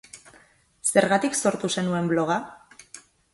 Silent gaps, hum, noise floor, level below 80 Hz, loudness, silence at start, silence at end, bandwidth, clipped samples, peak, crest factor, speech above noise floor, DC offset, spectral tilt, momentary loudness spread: none; none; -57 dBFS; -64 dBFS; -24 LUFS; 0.15 s; 0.35 s; 12 kHz; under 0.1%; -2 dBFS; 24 dB; 34 dB; under 0.1%; -4 dB/octave; 23 LU